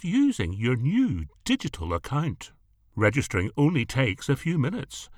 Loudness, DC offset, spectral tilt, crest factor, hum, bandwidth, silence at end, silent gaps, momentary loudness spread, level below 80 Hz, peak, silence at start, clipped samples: -26 LUFS; under 0.1%; -6 dB/octave; 18 dB; none; 15 kHz; 0.05 s; none; 9 LU; -46 dBFS; -8 dBFS; 0 s; under 0.1%